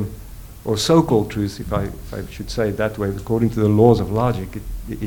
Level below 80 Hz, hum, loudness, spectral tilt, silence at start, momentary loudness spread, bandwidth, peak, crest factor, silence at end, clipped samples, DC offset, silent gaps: -36 dBFS; none; -19 LUFS; -6.5 dB/octave; 0 s; 17 LU; 19 kHz; 0 dBFS; 20 dB; 0 s; under 0.1%; under 0.1%; none